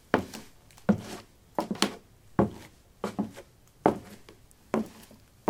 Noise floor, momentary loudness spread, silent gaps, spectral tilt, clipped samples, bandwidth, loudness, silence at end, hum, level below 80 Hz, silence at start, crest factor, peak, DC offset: -55 dBFS; 21 LU; none; -5.5 dB/octave; under 0.1%; 18 kHz; -32 LUFS; 0.45 s; none; -60 dBFS; 0.15 s; 28 dB; -4 dBFS; under 0.1%